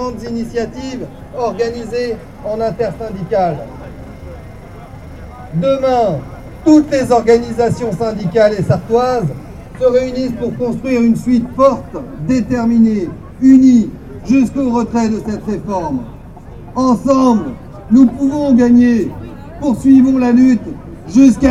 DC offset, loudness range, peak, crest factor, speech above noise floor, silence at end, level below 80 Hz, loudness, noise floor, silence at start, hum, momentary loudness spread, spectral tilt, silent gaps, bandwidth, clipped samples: under 0.1%; 8 LU; 0 dBFS; 14 dB; 20 dB; 0 s; -36 dBFS; -13 LUFS; -32 dBFS; 0 s; none; 21 LU; -7.5 dB/octave; none; 11 kHz; under 0.1%